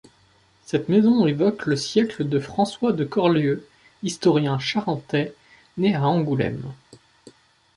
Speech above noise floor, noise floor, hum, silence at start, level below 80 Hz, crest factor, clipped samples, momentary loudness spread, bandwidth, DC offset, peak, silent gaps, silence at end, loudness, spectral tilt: 37 dB; -58 dBFS; none; 0.7 s; -58 dBFS; 18 dB; under 0.1%; 12 LU; 11.5 kHz; under 0.1%; -6 dBFS; none; 1.05 s; -22 LUFS; -6.5 dB/octave